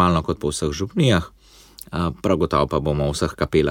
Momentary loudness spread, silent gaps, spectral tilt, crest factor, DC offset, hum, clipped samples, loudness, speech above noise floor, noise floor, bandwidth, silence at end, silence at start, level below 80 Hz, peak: 7 LU; none; -6 dB/octave; 18 dB; under 0.1%; none; under 0.1%; -21 LUFS; 24 dB; -45 dBFS; 17.5 kHz; 0 s; 0 s; -36 dBFS; -4 dBFS